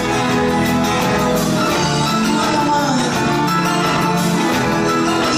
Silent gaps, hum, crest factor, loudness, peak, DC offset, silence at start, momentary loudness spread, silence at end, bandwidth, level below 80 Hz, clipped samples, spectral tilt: none; none; 12 dB; -16 LUFS; -4 dBFS; under 0.1%; 0 s; 1 LU; 0 s; 16 kHz; -40 dBFS; under 0.1%; -4.5 dB/octave